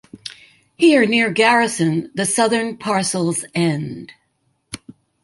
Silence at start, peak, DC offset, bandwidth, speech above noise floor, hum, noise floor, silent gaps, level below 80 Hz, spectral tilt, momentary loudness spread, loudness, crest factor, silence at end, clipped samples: 0.15 s; -2 dBFS; under 0.1%; 12 kHz; 49 dB; none; -67 dBFS; none; -60 dBFS; -4 dB/octave; 21 LU; -17 LUFS; 18 dB; 0.45 s; under 0.1%